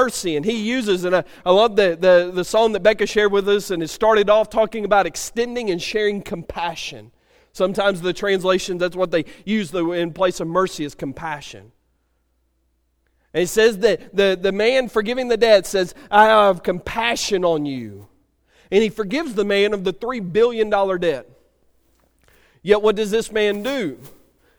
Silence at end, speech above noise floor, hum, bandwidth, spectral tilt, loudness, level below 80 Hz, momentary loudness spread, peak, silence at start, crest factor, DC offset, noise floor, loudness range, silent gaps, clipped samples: 0.5 s; 47 dB; none; 20 kHz; -4 dB/octave; -19 LUFS; -48 dBFS; 11 LU; 0 dBFS; 0 s; 20 dB; under 0.1%; -66 dBFS; 6 LU; none; under 0.1%